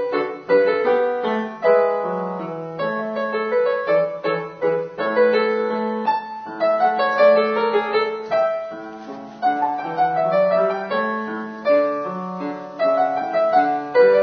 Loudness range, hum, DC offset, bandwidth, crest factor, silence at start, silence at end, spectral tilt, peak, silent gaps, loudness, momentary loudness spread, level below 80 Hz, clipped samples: 2 LU; none; under 0.1%; 6.2 kHz; 16 dB; 0 s; 0 s; -7 dB/octave; -4 dBFS; none; -20 LUFS; 11 LU; -68 dBFS; under 0.1%